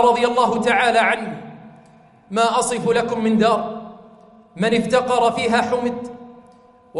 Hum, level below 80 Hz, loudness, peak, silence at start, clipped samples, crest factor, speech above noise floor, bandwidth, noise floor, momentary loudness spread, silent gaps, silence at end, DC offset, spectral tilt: none; -56 dBFS; -18 LUFS; -4 dBFS; 0 s; under 0.1%; 16 dB; 31 dB; 11.5 kHz; -49 dBFS; 18 LU; none; 0 s; under 0.1%; -4.5 dB/octave